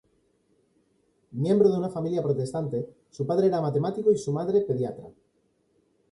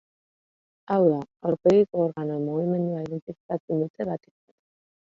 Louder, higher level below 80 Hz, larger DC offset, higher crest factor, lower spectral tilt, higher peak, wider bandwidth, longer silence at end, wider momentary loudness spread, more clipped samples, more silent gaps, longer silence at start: about the same, -26 LUFS vs -25 LUFS; about the same, -66 dBFS vs -66 dBFS; neither; about the same, 18 dB vs 18 dB; second, -8 dB/octave vs -9.5 dB/octave; about the same, -10 dBFS vs -8 dBFS; first, 11 kHz vs 7.6 kHz; about the same, 1 s vs 0.95 s; about the same, 12 LU vs 13 LU; neither; second, none vs 3.22-3.27 s, 3.40-3.49 s, 3.60-3.68 s, 3.90-3.94 s; first, 1.3 s vs 0.9 s